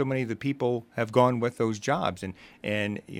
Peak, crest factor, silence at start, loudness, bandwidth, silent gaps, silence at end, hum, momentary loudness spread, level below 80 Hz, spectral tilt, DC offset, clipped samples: -6 dBFS; 22 dB; 0 s; -28 LUFS; 15 kHz; none; 0 s; none; 10 LU; -64 dBFS; -6 dB/octave; under 0.1%; under 0.1%